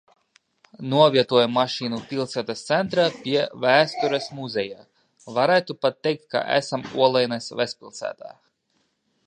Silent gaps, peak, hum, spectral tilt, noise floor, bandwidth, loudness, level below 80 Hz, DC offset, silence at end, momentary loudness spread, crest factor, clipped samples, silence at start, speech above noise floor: none; -2 dBFS; none; -5 dB/octave; -70 dBFS; 10 kHz; -22 LUFS; -70 dBFS; under 0.1%; 0.95 s; 11 LU; 20 dB; under 0.1%; 0.8 s; 48 dB